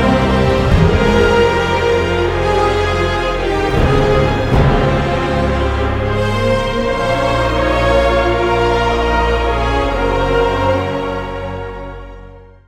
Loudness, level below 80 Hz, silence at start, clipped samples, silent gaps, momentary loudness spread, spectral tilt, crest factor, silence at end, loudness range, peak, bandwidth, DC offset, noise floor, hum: -14 LUFS; -22 dBFS; 0 s; under 0.1%; none; 5 LU; -6.5 dB/octave; 14 dB; 0.25 s; 2 LU; 0 dBFS; 14 kHz; under 0.1%; -36 dBFS; none